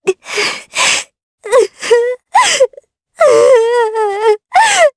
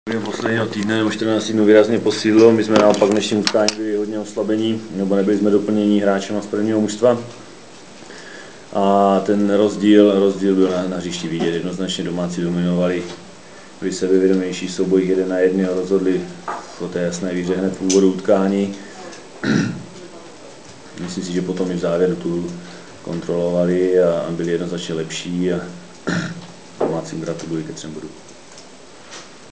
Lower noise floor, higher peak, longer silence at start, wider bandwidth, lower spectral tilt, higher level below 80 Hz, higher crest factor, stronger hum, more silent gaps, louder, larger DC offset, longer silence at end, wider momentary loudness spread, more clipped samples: about the same, -42 dBFS vs -41 dBFS; about the same, 0 dBFS vs 0 dBFS; about the same, 0.05 s vs 0.05 s; first, 11 kHz vs 8 kHz; second, -0.5 dB/octave vs -5.5 dB/octave; about the same, -58 dBFS vs -54 dBFS; second, 12 dB vs 18 dB; neither; first, 1.23-1.38 s vs none; first, -11 LUFS vs -18 LUFS; second, under 0.1% vs 0.5%; about the same, 0.05 s vs 0.05 s; second, 7 LU vs 21 LU; neither